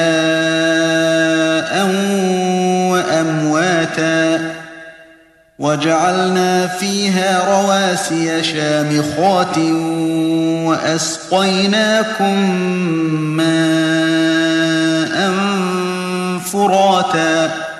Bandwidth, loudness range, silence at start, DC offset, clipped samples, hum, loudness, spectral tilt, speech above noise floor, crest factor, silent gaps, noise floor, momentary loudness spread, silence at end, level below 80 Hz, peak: 13 kHz; 2 LU; 0 s; under 0.1%; under 0.1%; none; -15 LUFS; -4.5 dB/octave; 33 dB; 14 dB; none; -47 dBFS; 4 LU; 0 s; -58 dBFS; -2 dBFS